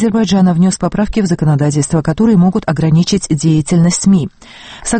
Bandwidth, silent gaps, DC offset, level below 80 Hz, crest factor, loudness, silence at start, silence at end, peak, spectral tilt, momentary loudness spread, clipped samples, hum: 8.8 kHz; none; under 0.1%; -34 dBFS; 10 dB; -12 LUFS; 0 s; 0 s; 0 dBFS; -6 dB/octave; 5 LU; under 0.1%; none